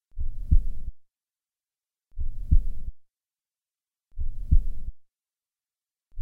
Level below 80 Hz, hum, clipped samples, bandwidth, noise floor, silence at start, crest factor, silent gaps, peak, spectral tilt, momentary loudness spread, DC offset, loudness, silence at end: -28 dBFS; none; under 0.1%; 0.6 kHz; under -90 dBFS; 0.15 s; 20 dB; none; -6 dBFS; -11 dB/octave; 18 LU; under 0.1%; -30 LUFS; 0 s